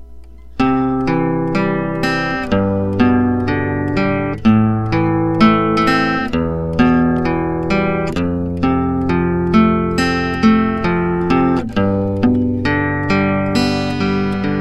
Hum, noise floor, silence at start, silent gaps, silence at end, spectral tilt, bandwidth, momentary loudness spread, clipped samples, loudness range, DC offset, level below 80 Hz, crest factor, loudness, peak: none; -37 dBFS; 0 s; none; 0 s; -7.5 dB/octave; 12 kHz; 5 LU; under 0.1%; 2 LU; 1%; -34 dBFS; 16 dB; -16 LUFS; 0 dBFS